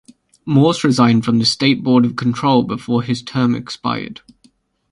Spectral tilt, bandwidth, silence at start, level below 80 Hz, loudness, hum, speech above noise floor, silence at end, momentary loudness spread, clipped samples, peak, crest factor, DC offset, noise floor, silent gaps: -6 dB/octave; 11.5 kHz; 0.45 s; -54 dBFS; -16 LUFS; none; 40 dB; 0.8 s; 9 LU; under 0.1%; 0 dBFS; 16 dB; under 0.1%; -56 dBFS; none